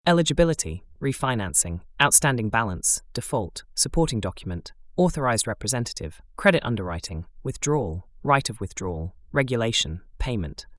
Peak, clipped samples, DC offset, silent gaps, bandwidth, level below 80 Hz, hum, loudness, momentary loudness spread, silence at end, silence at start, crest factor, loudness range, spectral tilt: -2 dBFS; under 0.1%; under 0.1%; none; 12 kHz; -40 dBFS; none; -24 LUFS; 12 LU; 0 s; 0.05 s; 22 dB; 4 LU; -3.5 dB/octave